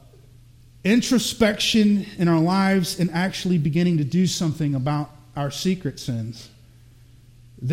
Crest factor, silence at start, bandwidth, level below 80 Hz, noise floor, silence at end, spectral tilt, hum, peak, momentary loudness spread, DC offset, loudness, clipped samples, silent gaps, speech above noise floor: 18 dB; 0.85 s; 16.5 kHz; -50 dBFS; -49 dBFS; 0 s; -5.5 dB/octave; none; -4 dBFS; 11 LU; under 0.1%; -22 LUFS; under 0.1%; none; 28 dB